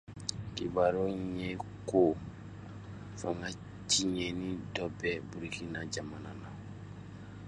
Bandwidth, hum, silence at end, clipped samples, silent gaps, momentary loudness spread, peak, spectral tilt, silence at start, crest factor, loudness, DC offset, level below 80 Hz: 11.5 kHz; none; 0 s; under 0.1%; none; 18 LU; -12 dBFS; -4 dB/octave; 0.05 s; 24 dB; -35 LUFS; under 0.1%; -56 dBFS